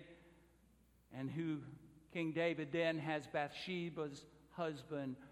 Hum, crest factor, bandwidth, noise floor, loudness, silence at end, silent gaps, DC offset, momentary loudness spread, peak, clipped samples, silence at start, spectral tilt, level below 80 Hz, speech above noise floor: none; 20 dB; 13 kHz; -71 dBFS; -42 LUFS; 0 s; none; under 0.1%; 18 LU; -24 dBFS; under 0.1%; 0 s; -6.5 dB/octave; -76 dBFS; 29 dB